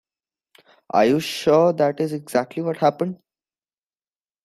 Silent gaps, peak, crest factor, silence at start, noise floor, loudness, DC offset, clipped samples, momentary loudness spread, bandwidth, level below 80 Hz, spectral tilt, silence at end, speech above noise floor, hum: none; -4 dBFS; 18 dB; 0.95 s; under -90 dBFS; -21 LUFS; under 0.1%; under 0.1%; 10 LU; 14.5 kHz; -64 dBFS; -6 dB/octave; 1.3 s; over 70 dB; none